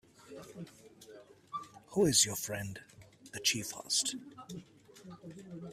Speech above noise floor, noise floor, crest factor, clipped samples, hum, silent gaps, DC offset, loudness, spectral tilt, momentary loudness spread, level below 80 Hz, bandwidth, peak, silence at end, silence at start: 23 dB; -56 dBFS; 24 dB; under 0.1%; none; none; under 0.1%; -32 LUFS; -2.5 dB/octave; 24 LU; -68 dBFS; 15.5 kHz; -12 dBFS; 0 s; 0.2 s